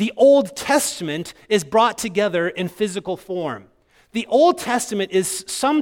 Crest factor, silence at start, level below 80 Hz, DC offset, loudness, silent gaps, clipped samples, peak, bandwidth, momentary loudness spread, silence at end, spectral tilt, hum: 16 dB; 0 s; -58 dBFS; under 0.1%; -20 LUFS; none; under 0.1%; -4 dBFS; 17 kHz; 12 LU; 0 s; -4 dB/octave; none